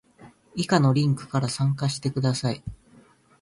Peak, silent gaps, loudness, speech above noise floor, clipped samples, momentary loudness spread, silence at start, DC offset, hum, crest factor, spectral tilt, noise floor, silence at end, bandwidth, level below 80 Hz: -8 dBFS; none; -25 LUFS; 32 dB; under 0.1%; 13 LU; 0.2 s; under 0.1%; none; 18 dB; -6 dB/octave; -56 dBFS; 0.65 s; 11.5 kHz; -54 dBFS